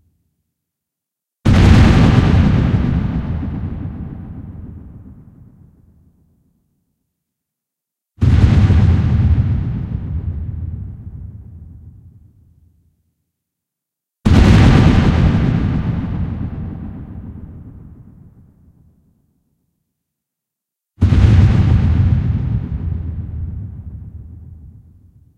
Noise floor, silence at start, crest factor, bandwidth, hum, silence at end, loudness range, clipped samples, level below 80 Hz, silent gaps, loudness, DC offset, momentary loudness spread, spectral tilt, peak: -83 dBFS; 1.45 s; 16 dB; 9 kHz; none; 0.7 s; 17 LU; under 0.1%; -22 dBFS; none; -15 LUFS; under 0.1%; 23 LU; -8 dB/octave; 0 dBFS